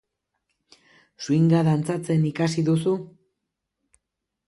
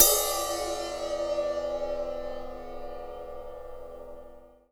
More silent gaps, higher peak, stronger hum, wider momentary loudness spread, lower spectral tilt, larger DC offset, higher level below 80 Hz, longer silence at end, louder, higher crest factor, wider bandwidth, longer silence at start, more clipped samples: neither; second, -10 dBFS vs 0 dBFS; second, none vs 50 Hz at -75 dBFS; second, 7 LU vs 16 LU; first, -7.5 dB/octave vs -1 dB/octave; neither; second, -64 dBFS vs -48 dBFS; first, 1.45 s vs 0.25 s; first, -22 LUFS vs -30 LUFS; second, 16 dB vs 30 dB; second, 11.5 kHz vs over 20 kHz; first, 1.2 s vs 0 s; neither